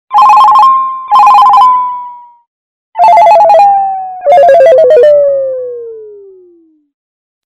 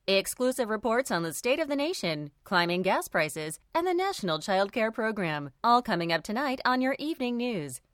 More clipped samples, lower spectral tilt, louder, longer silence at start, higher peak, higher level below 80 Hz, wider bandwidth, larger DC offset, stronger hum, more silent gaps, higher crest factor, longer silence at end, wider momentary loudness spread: first, 4% vs under 0.1%; about the same, -3 dB/octave vs -4 dB/octave; first, -5 LUFS vs -28 LUFS; about the same, 0.1 s vs 0.1 s; first, 0 dBFS vs -10 dBFS; first, -54 dBFS vs -64 dBFS; second, 12 kHz vs 17.5 kHz; neither; neither; first, 2.47-2.93 s vs none; second, 6 dB vs 18 dB; first, 1.35 s vs 0.15 s; first, 15 LU vs 6 LU